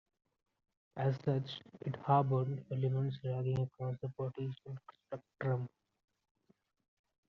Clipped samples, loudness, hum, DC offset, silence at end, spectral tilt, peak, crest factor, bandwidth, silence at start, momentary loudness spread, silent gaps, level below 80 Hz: under 0.1%; -37 LUFS; none; under 0.1%; 1.6 s; -7.5 dB/octave; -18 dBFS; 22 dB; 5.8 kHz; 0.95 s; 17 LU; none; -74 dBFS